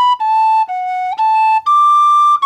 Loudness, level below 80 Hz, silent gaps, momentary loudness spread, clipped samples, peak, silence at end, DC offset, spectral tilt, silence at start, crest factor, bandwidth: -12 LUFS; -70 dBFS; none; 9 LU; under 0.1%; -6 dBFS; 0 s; under 0.1%; 1 dB/octave; 0 s; 6 dB; 11.5 kHz